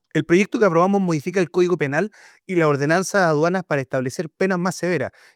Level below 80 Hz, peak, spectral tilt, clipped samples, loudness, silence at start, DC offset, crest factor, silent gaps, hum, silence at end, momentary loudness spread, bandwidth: -64 dBFS; -4 dBFS; -6 dB/octave; under 0.1%; -20 LUFS; 0.15 s; under 0.1%; 16 dB; none; none; 0.25 s; 8 LU; 15 kHz